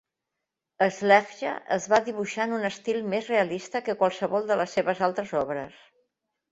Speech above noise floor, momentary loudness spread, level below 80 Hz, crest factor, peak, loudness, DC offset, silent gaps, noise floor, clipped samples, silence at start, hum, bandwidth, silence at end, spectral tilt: 59 dB; 10 LU; -70 dBFS; 22 dB; -4 dBFS; -26 LUFS; under 0.1%; none; -85 dBFS; under 0.1%; 0.8 s; none; 8.2 kHz; 0.85 s; -4.5 dB/octave